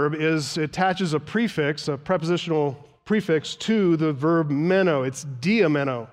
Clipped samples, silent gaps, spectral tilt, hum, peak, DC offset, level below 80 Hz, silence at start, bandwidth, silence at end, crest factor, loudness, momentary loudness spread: under 0.1%; none; -6 dB/octave; none; -8 dBFS; under 0.1%; -62 dBFS; 0 s; 13.5 kHz; 0.05 s; 14 dB; -23 LUFS; 6 LU